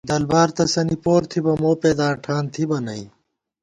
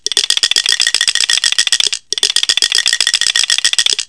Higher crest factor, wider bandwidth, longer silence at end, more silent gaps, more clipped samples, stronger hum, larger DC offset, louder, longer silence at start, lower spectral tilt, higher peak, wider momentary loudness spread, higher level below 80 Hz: about the same, 16 dB vs 14 dB; about the same, 10.5 kHz vs 11 kHz; first, 0.55 s vs 0.05 s; neither; second, under 0.1% vs 0.8%; neither; second, under 0.1% vs 0.4%; second, -20 LUFS vs -10 LUFS; about the same, 0.05 s vs 0.05 s; first, -5.5 dB/octave vs 4 dB/octave; second, -4 dBFS vs 0 dBFS; first, 7 LU vs 2 LU; first, -50 dBFS vs -56 dBFS